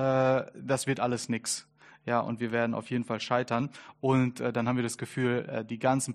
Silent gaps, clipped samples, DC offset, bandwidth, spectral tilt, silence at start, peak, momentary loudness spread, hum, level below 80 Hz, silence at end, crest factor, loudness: none; under 0.1%; under 0.1%; 13 kHz; -5 dB/octave; 0 s; -12 dBFS; 7 LU; none; -68 dBFS; 0 s; 18 dB; -30 LUFS